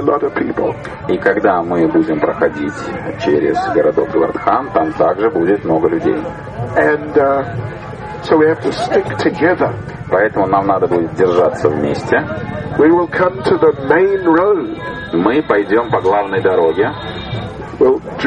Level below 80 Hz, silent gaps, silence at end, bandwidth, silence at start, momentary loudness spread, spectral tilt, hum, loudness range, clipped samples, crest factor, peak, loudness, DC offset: -42 dBFS; none; 0 s; 9.6 kHz; 0 s; 11 LU; -7.5 dB/octave; none; 2 LU; under 0.1%; 14 dB; 0 dBFS; -15 LUFS; under 0.1%